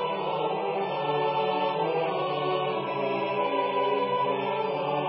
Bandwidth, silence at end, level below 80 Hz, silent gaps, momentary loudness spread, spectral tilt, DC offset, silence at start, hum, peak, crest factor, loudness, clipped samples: 5.6 kHz; 0 s; -82 dBFS; none; 3 LU; -3 dB/octave; under 0.1%; 0 s; none; -16 dBFS; 12 dB; -27 LUFS; under 0.1%